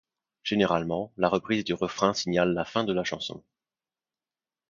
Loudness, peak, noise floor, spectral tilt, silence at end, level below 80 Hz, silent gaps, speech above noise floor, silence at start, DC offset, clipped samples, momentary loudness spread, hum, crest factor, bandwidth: -27 LUFS; -8 dBFS; under -90 dBFS; -5 dB/octave; 1.3 s; -60 dBFS; none; over 63 dB; 0.45 s; under 0.1%; under 0.1%; 9 LU; none; 22 dB; 7.4 kHz